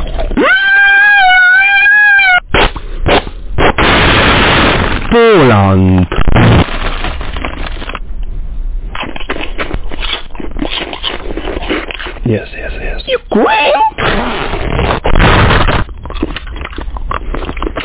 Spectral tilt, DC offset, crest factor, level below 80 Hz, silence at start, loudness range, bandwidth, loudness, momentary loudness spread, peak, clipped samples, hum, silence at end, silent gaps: -9 dB/octave; under 0.1%; 10 dB; -20 dBFS; 0 s; 13 LU; 4 kHz; -9 LUFS; 18 LU; 0 dBFS; under 0.1%; none; 0 s; none